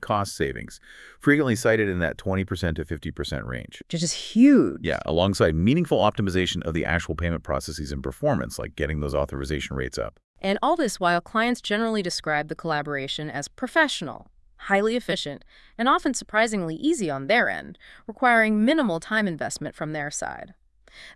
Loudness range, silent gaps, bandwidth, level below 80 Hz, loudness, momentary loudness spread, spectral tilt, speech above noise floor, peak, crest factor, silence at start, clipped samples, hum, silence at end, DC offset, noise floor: 5 LU; 10.24-10.34 s; 12 kHz; -44 dBFS; -24 LUFS; 12 LU; -5 dB/octave; 25 dB; -6 dBFS; 18 dB; 0 s; under 0.1%; none; 0.05 s; under 0.1%; -49 dBFS